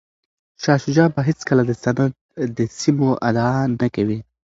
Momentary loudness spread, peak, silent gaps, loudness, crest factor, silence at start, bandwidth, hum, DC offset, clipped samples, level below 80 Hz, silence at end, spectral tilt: 6 LU; 0 dBFS; 2.21-2.29 s; -19 LUFS; 18 dB; 0.6 s; 7.8 kHz; none; under 0.1%; under 0.1%; -52 dBFS; 0.25 s; -7 dB/octave